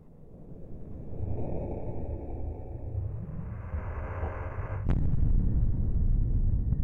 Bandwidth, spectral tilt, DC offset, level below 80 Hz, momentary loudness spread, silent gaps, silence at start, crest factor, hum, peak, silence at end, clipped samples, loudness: 2.9 kHz; -11.5 dB/octave; under 0.1%; -32 dBFS; 16 LU; none; 0.05 s; 14 dB; none; -14 dBFS; 0 s; under 0.1%; -33 LUFS